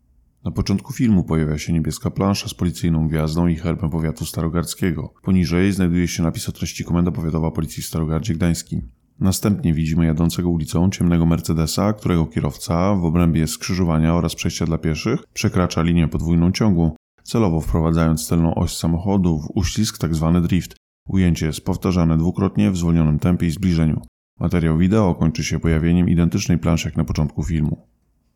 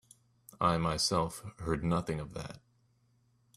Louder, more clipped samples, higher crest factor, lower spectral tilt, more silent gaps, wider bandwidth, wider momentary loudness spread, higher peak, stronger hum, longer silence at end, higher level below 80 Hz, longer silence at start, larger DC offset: first, -20 LUFS vs -33 LUFS; neither; second, 12 dB vs 22 dB; first, -6.5 dB/octave vs -4.5 dB/octave; first, 16.96-17.18 s, 20.77-21.06 s, 24.08-24.37 s vs none; first, 17.5 kHz vs 13.5 kHz; second, 6 LU vs 13 LU; first, -6 dBFS vs -14 dBFS; neither; second, 0.6 s vs 1 s; first, -34 dBFS vs -54 dBFS; second, 0.45 s vs 0.6 s; first, 0.1% vs under 0.1%